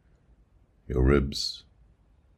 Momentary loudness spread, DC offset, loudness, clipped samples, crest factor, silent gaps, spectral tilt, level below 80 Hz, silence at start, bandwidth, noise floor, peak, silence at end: 11 LU; under 0.1%; -27 LUFS; under 0.1%; 20 dB; none; -6 dB/octave; -34 dBFS; 0.9 s; 12.5 kHz; -62 dBFS; -8 dBFS; 0.8 s